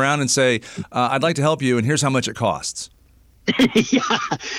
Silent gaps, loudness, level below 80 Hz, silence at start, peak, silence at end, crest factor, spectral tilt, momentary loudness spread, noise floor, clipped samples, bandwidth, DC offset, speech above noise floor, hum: none; -19 LUFS; -54 dBFS; 0 s; -6 dBFS; 0 s; 14 dB; -4 dB/octave; 10 LU; -53 dBFS; under 0.1%; 16 kHz; under 0.1%; 33 dB; none